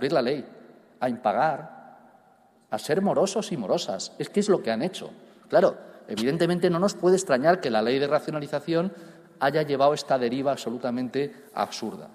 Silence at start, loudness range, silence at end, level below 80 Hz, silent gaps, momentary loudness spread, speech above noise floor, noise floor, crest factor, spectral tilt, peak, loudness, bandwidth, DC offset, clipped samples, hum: 0 s; 4 LU; 0.05 s; -70 dBFS; none; 11 LU; 34 dB; -59 dBFS; 18 dB; -5 dB/octave; -8 dBFS; -26 LUFS; 15.5 kHz; under 0.1%; under 0.1%; none